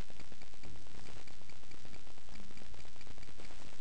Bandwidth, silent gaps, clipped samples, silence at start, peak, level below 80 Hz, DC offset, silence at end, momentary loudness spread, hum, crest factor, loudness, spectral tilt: 9.4 kHz; none; under 0.1%; 0 s; -26 dBFS; -60 dBFS; 4%; 0 s; 2 LU; none; 18 dB; -55 LUFS; -4.5 dB/octave